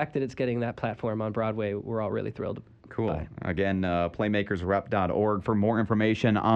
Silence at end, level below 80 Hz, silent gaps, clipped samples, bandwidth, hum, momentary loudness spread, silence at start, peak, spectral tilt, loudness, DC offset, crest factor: 0 s; -52 dBFS; none; under 0.1%; 8 kHz; none; 8 LU; 0 s; -10 dBFS; -8 dB/octave; -28 LUFS; under 0.1%; 18 dB